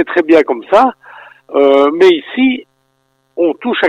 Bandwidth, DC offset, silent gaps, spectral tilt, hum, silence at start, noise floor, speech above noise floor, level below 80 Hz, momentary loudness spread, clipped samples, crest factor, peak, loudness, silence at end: 8.8 kHz; under 0.1%; none; -5 dB/octave; none; 0 s; -61 dBFS; 50 dB; -56 dBFS; 8 LU; under 0.1%; 12 dB; 0 dBFS; -11 LUFS; 0 s